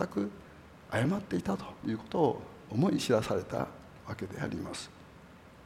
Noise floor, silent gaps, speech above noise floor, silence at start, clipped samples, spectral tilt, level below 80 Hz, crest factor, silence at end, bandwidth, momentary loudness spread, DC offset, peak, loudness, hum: -54 dBFS; none; 22 dB; 0 s; under 0.1%; -6 dB/octave; -60 dBFS; 20 dB; 0 s; 16 kHz; 22 LU; under 0.1%; -14 dBFS; -33 LUFS; none